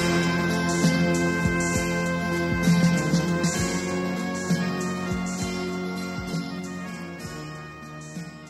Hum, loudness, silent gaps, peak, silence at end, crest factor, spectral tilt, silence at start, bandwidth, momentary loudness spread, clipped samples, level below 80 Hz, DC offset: none; -25 LUFS; none; -8 dBFS; 0 s; 16 dB; -5 dB/octave; 0 s; 13.5 kHz; 14 LU; under 0.1%; -46 dBFS; under 0.1%